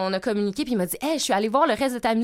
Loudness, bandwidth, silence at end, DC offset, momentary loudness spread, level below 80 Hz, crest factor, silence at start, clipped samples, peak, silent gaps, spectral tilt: -23 LUFS; 16.5 kHz; 0 s; under 0.1%; 5 LU; -56 dBFS; 16 dB; 0 s; under 0.1%; -8 dBFS; none; -4 dB/octave